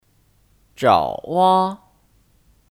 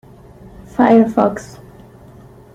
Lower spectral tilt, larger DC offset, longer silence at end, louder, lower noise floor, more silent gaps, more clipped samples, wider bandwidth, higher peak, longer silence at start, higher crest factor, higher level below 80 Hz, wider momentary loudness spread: second, -6 dB/octave vs -7.5 dB/octave; neither; about the same, 1 s vs 1.1 s; second, -18 LUFS vs -14 LUFS; first, -59 dBFS vs -41 dBFS; neither; neither; first, 16 kHz vs 9.4 kHz; about the same, -2 dBFS vs -2 dBFS; about the same, 0.8 s vs 0.8 s; about the same, 20 dB vs 16 dB; second, -56 dBFS vs -48 dBFS; second, 9 LU vs 19 LU